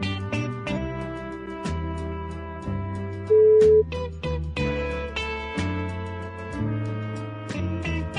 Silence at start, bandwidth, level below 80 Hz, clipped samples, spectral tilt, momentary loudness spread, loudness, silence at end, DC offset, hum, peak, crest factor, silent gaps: 0 s; 10 kHz; -40 dBFS; under 0.1%; -7 dB/octave; 16 LU; -26 LUFS; 0 s; under 0.1%; none; -8 dBFS; 16 dB; none